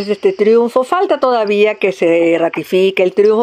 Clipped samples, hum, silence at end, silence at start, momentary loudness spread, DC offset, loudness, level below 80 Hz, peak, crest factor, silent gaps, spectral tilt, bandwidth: under 0.1%; none; 0 s; 0 s; 3 LU; under 0.1%; -13 LUFS; -64 dBFS; 0 dBFS; 12 dB; none; -6 dB/octave; 15 kHz